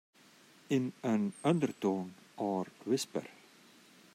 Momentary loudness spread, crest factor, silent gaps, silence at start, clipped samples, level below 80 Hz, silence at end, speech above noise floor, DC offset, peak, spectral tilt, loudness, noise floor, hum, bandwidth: 9 LU; 18 dB; none; 0.7 s; under 0.1%; -82 dBFS; 0.85 s; 28 dB; under 0.1%; -16 dBFS; -6 dB/octave; -35 LUFS; -62 dBFS; none; 15.5 kHz